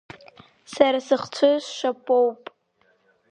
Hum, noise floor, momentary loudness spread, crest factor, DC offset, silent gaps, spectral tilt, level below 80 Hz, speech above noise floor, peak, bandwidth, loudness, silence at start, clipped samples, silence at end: none; -65 dBFS; 9 LU; 22 dB; under 0.1%; none; -3.5 dB/octave; -70 dBFS; 44 dB; -2 dBFS; 9.8 kHz; -22 LUFS; 0.7 s; under 0.1%; 0.95 s